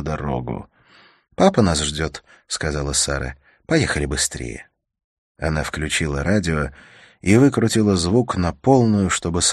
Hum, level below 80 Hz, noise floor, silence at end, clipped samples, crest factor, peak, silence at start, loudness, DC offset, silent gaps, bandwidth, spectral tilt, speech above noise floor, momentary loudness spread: none; -36 dBFS; -53 dBFS; 0 s; under 0.1%; 20 dB; 0 dBFS; 0 s; -20 LUFS; under 0.1%; 5.04-5.35 s; 13 kHz; -4.5 dB/octave; 33 dB; 14 LU